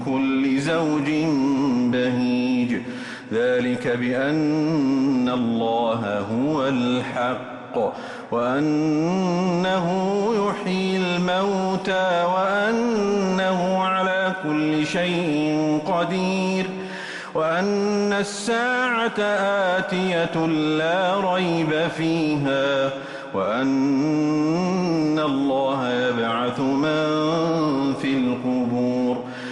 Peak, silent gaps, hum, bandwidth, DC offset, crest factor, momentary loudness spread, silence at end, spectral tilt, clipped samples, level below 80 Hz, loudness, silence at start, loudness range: -10 dBFS; none; none; 11.5 kHz; under 0.1%; 12 dB; 4 LU; 0 s; -6 dB/octave; under 0.1%; -60 dBFS; -22 LUFS; 0 s; 2 LU